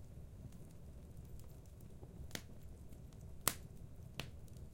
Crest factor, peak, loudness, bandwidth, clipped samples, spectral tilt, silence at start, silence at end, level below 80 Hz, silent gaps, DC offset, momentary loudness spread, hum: 40 dB; -10 dBFS; -49 LUFS; 16.5 kHz; under 0.1%; -3 dB/octave; 0 s; 0 s; -58 dBFS; none; under 0.1%; 17 LU; none